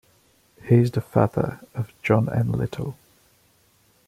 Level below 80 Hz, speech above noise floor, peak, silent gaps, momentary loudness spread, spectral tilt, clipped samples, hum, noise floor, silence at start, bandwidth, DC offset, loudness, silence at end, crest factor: -52 dBFS; 39 dB; -4 dBFS; none; 14 LU; -9 dB/octave; under 0.1%; none; -61 dBFS; 0.65 s; 13.5 kHz; under 0.1%; -23 LUFS; 1.15 s; 20 dB